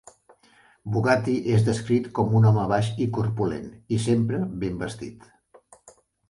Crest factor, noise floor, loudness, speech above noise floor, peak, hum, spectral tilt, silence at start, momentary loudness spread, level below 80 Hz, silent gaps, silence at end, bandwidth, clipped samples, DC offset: 18 dB; -58 dBFS; -24 LUFS; 35 dB; -8 dBFS; none; -7.5 dB/octave; 0.85 s; 13 LU; -52 dBFS; none; 0.4 s; 11.5 kHz; under 0.1%; under 0.1%